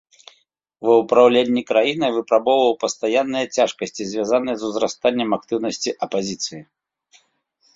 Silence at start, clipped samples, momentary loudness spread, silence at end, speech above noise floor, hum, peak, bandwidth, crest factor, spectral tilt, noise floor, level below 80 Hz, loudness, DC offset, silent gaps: 0.8 s; under 0.1%; 11 LU; 1.1 s; 45 dB; none; -2 dBFS; 7.8 kHz; 18 dB; -3.5 dB/octave; -64 dBFS; -64 dBFS; -19 LUFS; under 0.1%; none